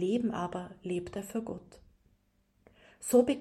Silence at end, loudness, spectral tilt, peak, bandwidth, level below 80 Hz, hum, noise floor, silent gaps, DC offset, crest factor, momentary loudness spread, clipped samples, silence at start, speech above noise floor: 0 s; -33 LUFS; -5.5 dB/octave; -12 dBFS; 15.5 kHz; -64 dBFS; none; -72 dBFS; none; under 0.1%; 20 dB; 15 LU; under 0.1%; 0 s; 40 dB